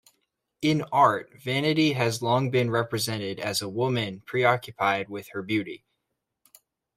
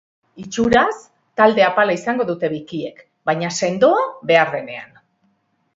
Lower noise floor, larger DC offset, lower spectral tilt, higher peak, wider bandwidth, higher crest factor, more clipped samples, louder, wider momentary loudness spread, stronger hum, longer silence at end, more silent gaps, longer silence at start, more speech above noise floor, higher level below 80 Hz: first, -81 dBFS vs -65 dBFS; neither; about the same, -5 dB/octave vs -4.5 dB/octave; second, -6 dBFS vs 0 dBFS; first, 16 kHz vs 8 kHz; about the same, 20 dB vs 18 dB; neither; second, -26 LUFS vs -18 LUFS; second, 8 LU vs 16 LU; neither; first, 1.2 s vs 0.9 s; neither; first, 0.6 s vs 0.35 s; first, 56 dB vs 47 dB; second, -66 dBFS vs -52 dBFS